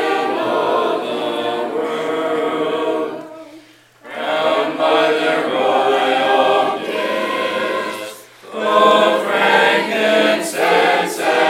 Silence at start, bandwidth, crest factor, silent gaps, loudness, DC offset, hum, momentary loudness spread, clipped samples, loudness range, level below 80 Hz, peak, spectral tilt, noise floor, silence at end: 0 s; 16.5 kHz; 16 dB; none; -16 LUFS; under 0.1%; none; 10 LU; under 0.1%; 6 LU; -72 dBFS; 0 dBFS; -3 dB/octave; -45 dBFS; 0 s